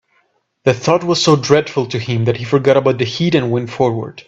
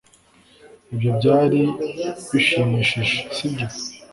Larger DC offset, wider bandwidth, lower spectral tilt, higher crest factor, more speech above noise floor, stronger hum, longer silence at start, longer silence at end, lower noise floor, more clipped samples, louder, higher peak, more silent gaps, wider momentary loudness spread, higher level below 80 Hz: neither; second, 8.2 kHz vs 11.5 kHz; about the same, -5.5 dB/octave vs -5.5 dB/octave; about the same, 16 dB vs 18 dB; first, 47 dB vs 34 dB; neither; about the same, 0.65 s vs 0.65 s; about the same, 0.05 s vs 0.15 s; first, -61 dBFS vs -54 dBFS; neither; first, -15 LUFS vs -20 LUFS; first, 0 dBFS vs -4 dBFS; neither; second, 7 LU vs 11 LU; about the same, -52 dBFS vs -54 dBFS